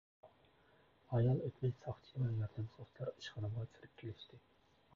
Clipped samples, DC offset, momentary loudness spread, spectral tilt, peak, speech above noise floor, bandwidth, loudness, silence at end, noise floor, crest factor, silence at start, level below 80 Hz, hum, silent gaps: under 0.1%; under 0.1%; 16 LU; -8 dB/octave; -24 dBFS; 30 dB; 7 kHz; -42 LUFS; 0.55 s; -71 dBFS; 18 dB; 0.25 s; -66 dBFS; none; none